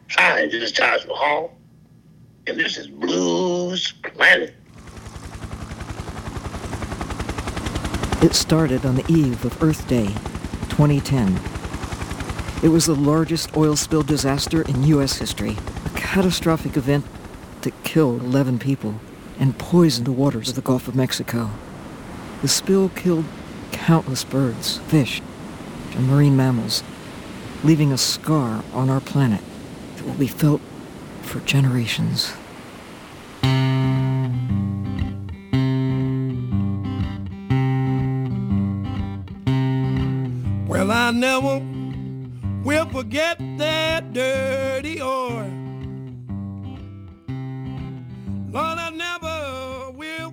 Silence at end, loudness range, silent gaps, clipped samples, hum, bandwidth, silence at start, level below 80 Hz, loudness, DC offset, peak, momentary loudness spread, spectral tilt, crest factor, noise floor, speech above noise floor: 0 s; 5 LU; none; under 0.1%; none; over 20 kHz; 0.1 s; -40 dBFS; -21 LUFS; under 0.1%; -2 dBFS; 17 LU; -5 dB/octave; 20 dB; -49 dBFS; 30 dB